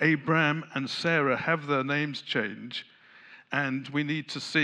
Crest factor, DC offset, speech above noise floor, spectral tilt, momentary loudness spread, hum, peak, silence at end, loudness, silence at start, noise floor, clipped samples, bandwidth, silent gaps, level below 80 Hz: 18 dB; under 0.1%; 25 dB; -5.5 dB/octave; 8 LU; none; -10 dBFS; 0 s; -28 LUFS; 0 s; -53 dBFS; under 0.1%; 10.5 kHz; none; -80 dBFS